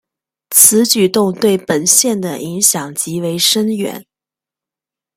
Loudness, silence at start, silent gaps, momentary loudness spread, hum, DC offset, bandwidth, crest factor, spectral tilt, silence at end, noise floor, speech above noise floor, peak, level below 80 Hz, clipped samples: -12 LUFS; 0.5 s; none; 13 LU; none; under 0.1%; over 20 kHz; 16 dB; -2.5 dB/octave; 1.15 s; -88 dBFS; 74 dB; 0 dBFS; -60 dBFS; 0.2%